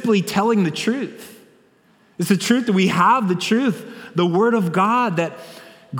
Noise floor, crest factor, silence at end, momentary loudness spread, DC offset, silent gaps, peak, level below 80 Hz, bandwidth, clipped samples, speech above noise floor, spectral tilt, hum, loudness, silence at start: -56 dBFS; 18 dB; 0 s; 13 LU; under 0.1%; none; -2 dBFS; -66 dBFS; 19 kHz; under 0.1%; 37 dB; -5.5 dB/octave; none; -19 LUFS; 0 s